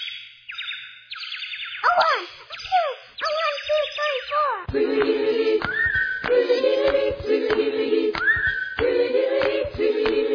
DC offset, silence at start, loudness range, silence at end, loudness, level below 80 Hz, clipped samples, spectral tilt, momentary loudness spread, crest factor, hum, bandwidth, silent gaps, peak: under 0.1%; 0 s; 3 LU; 0 s; -22 LUFS; -48 dBFS; under 0.1%; -5 dB/octave; 12 LU; 14 dB; none; 5.4 kHz; none; -8 dBFS